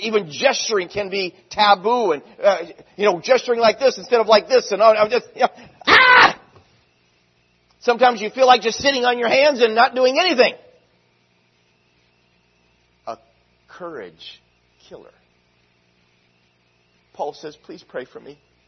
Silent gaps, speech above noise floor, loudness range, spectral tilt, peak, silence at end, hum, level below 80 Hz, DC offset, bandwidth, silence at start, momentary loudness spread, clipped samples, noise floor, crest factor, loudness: none; 44 dB; 22 LU; -2.5 dB/octave; 0 dBFS; 0.35 s; none; -62 dBFS; under 0.1%; 6.4 kHz; 0 s; 21 LU; under 0.1%; -62 dBFS; 20 dB; -16 LUFS